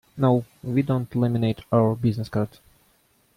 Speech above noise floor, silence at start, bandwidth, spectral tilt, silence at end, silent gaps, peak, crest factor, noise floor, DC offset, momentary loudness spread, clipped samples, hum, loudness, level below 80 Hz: 40 dB; 0.15 s; 15 kHz; -9 dB/octave; 0.9 s; none; -6 dBFS; 18 dB; -63 dBFS; under 0.1%; 6 LU; under 0.1%; none; -24 LUFS; -54 dBFS